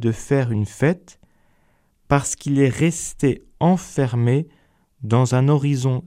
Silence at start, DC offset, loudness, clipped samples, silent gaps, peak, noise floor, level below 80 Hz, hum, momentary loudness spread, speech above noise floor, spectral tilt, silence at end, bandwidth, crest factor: 0 s; under 0.1%; -20 LUFS; under 0.1%; none; -4 dBFS; -61 dBFS; -48 dBFS; none; 5 LU; 42 dB; -6.5 dB/octave; 0 s; 13.5 kHz; 18 dB